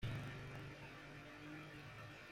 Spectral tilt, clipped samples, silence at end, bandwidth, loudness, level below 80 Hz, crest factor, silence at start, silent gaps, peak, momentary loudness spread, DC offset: -6 dB/octave; under 0.1%; 0 s; 16 kHz; -53 LUFS; -66 dBFS; 18 dB; 0 s; none; -34 dBFS; 6 LU; under 0.1%